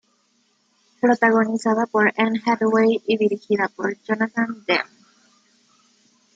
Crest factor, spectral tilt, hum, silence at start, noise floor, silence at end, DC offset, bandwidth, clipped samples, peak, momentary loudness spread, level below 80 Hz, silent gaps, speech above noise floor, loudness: 18 dB; -5.5 dB/octave; none; 1.05 s; -65 dBFS; 1.5 s; under 0.1%; 9 kHz; under 0.1%; -4 dBFS; 7 LU; -72 dBFS; none; 45 dB; -20 LUFS